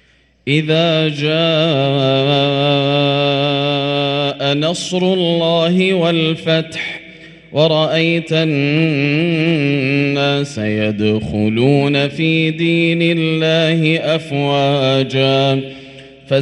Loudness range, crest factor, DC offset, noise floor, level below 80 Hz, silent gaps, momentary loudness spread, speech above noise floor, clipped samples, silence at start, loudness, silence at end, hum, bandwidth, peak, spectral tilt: 1 LU; 14 dB; under 0.1%; -38 dBFS; -52 dBFS; none; 4 LU; 24 dB; under 0.1%; 0.45 s; -15 LUFS; 0 s; none; 11 kHz; 0 dBFS; -6 dB/octave